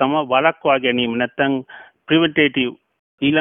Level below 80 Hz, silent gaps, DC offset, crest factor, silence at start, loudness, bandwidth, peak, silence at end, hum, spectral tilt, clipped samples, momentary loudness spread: -58 dBFS; 2.99-3.18 s; under 0.1%; 16 dB; 0 s; -18 LUFS; 3.8 kHz; -2 dBFS; 0 s; none; -9.5 dB/octave; under 0.1%; 6 LU